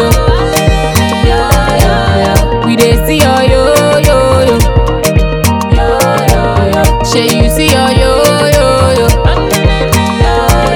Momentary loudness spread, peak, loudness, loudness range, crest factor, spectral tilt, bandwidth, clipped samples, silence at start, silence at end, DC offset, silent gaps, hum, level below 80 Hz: 3 LU; 0 dBFS; -9 LUFS; 1 LU; 8 dB; -5 dB/octave; over 20 kHz; 0.1%; 0 s; 0 s; under 0.1%; none; none; -14 dBFS